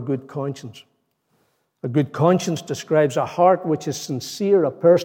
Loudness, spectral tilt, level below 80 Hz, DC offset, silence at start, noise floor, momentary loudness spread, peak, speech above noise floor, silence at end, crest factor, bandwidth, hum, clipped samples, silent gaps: -21 LUFS; -6 dB/octave; -72 dBFS; under 0.1%; 0 s; -67 dBFS; 12 LU; -4 dBFS; 47 dB; 0 s; 18 dB; 17 kHz; none; under 0.1%; none